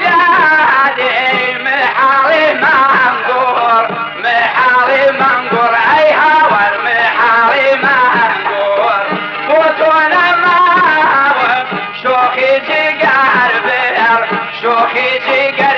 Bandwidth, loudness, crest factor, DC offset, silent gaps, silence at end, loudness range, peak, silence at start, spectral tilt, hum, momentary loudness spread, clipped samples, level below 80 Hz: 7.2 kHz; -10 LUFS; 10 dB; under 0.1%; none; 0 s; 2 LU; 0 dBFS; 0 s; -5 dB/octave; none; 5 LU; under 0.1%; -58 dBFS